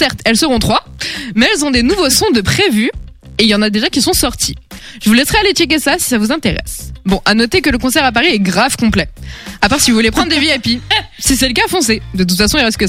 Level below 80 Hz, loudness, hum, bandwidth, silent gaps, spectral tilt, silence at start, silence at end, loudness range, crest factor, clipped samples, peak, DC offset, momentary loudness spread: -30 dBFS; -12 LUFS; none; 16.5 kHz; none; -3 dB/octave; 0 s; 0 s; 1 LU; 12 dB; under 0.1%; 0 dBFS; under 0.1%; 8 LU